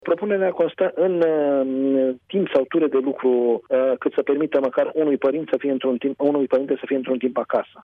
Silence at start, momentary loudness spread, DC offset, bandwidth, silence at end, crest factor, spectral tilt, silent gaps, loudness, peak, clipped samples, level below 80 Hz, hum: 0.05 s; 4 LU; under 0.1%; 4.6 kHz; 0.05 s; 12 dB; -8.5 dB/octave; none; -21 LUFS; -8 dBFS; under 0.1%; -72 dBFS; none